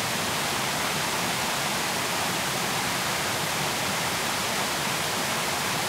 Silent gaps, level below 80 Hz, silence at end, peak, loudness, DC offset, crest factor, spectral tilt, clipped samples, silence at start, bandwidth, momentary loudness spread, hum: none; -56 dBFS; 0 s; -14 dBFS; -25 LUFS; under 0.1%; 14 dB; -2 dB/octave; under 0.1%; 0 s; 16 kHz; 0 LU; none